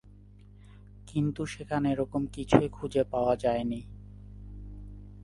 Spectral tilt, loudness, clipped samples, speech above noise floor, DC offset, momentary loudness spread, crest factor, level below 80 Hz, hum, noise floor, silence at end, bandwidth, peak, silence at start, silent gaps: -7 dB/octave; -29 LUFS; under 0.1%; 24 dB; under 0.1%; 22 LU; 28 dB; -48 dBFS; 50 Hz at -45 dBFS; -52 dBFS; 0 s; 11.5 kHz; -2 dBFS; 0.05 s; none